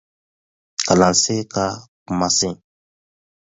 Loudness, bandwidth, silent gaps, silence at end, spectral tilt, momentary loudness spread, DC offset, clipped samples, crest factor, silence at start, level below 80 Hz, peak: -18 LUFS; 8 kHz; 1.88-2.06 s; 0.9 s; -3.5 dB/octave; 14 LU; under 0.1%; under 0.1%; 22 dB; 0.8 s; -50 dBFS; 0 dBFS